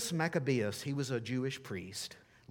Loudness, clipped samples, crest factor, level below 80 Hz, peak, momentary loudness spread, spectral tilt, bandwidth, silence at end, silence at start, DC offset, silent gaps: -36 LUFS; under 0.1%; 18 dB; -74 dBFS; -18 dBFS; 10 LU; -5 dB/octave; 18 kHz; 0.3 s; 0 s; under 0.1%; none